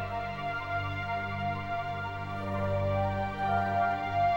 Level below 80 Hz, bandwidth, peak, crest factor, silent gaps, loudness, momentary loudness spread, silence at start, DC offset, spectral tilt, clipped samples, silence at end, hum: -52 dBFS; 16 kHz; -18 dBFS; 14 dB; none; -32 LUFS; 6 LU; 0 s; under 0.1%; -7.5 dB/octave; under 0.1%; 0 s; 50 Hz at -60 dBFS